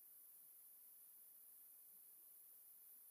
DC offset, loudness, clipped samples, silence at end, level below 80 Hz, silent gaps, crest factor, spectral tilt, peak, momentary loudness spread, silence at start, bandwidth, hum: under 0.1%; -61 LUFS; under 0.1%; 0 s; under -90 dBFS; none; 14 dB; 0.5 dB/octave; -52 dBFS; 0 LU; 0 s; 15.5 kHz; none